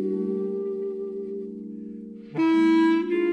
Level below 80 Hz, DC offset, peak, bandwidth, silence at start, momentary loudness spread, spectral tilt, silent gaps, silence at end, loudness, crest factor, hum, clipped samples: -70 dBFS; under 0.1%; -12 dBFS; 8.2 kHz; 0 s; 18 LU; -7.5 dB/octave; none; 0 s; -24 LUFS; 14 dB; none; under 0.1%